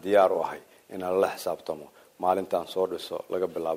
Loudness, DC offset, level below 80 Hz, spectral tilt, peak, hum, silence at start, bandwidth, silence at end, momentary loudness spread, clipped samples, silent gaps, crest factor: -28 LUFS; under 0.1%; -70 dBFS; -5 dB/octave; -8 dBFS; none; 0.05 s; 16 kHz; 0 s; 13 LU; under 0.1%; none; 18 dB